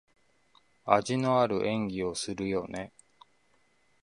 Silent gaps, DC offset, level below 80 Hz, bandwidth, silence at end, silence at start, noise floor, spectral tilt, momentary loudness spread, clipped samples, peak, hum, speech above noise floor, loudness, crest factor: none; under 0.1%; -62 dBFS; 11.5 kHz; 1.15 s; 0.85 s; -70 dBFS; -5.5 dB/octave; 15 LU; under 0.1%; -6 dBFS; none; 41 dB; -29 LUFS; 26 dB